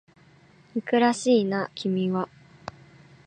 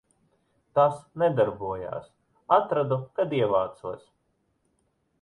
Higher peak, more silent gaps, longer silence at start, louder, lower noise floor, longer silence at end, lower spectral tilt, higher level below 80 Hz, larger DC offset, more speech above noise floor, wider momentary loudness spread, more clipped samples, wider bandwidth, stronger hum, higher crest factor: second, -8 dBFS vs -4 dBFS; neither; about the same, 0.75 s vs 0.75 s; about the same, -25 LUFS vs -26 LUFS; second, -56 dBFS vs -73 dBFS; second, 0.55 s vs 1.25 s; second, -5.5 dB/octave vs -8 dB/octave; second, -68 dBFS vs -62 dBFS; neither; second, 32 dB vs 47 dB; first, 21 LU vs 15 LU; neither; second, 9.6 kHz vs 11 kHz; neither; second, 18 dB vs 24 dB